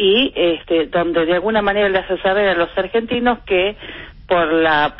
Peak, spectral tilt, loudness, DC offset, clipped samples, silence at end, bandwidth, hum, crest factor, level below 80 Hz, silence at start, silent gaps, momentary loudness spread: -2 dBFS; -10 dB/octave; -17 LUFS; under 0.1%; under 0.1%; 0 s; 5.8 kHz; none; 14 dB; -42 dBFS; 0 s; none; 5 LU